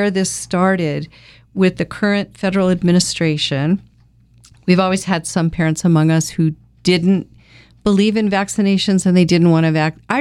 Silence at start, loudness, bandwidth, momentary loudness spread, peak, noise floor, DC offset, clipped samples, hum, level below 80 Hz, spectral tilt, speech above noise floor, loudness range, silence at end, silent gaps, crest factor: 0 s; -16 LUFS; 12.5 kHz; 7 LU; 0 dBFS; -50 dBFS; under 0.1%; under 0.1%; none; -46 dBFS; -5.5 dB/octave; 35 dB; 2 LU; 0 s; none; 16 dB